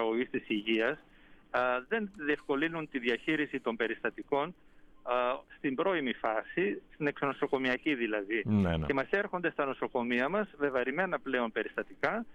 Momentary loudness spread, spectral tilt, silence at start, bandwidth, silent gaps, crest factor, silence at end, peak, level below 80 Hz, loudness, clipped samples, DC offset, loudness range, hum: 4 LU; -7 dB/octave; 0 s; 9.2 kHz; none; 16 dB; 0 s; -16 dBFS; -58 dBFS; -32 LUFS; under 0.1%; under 0.1%; 2 LU; none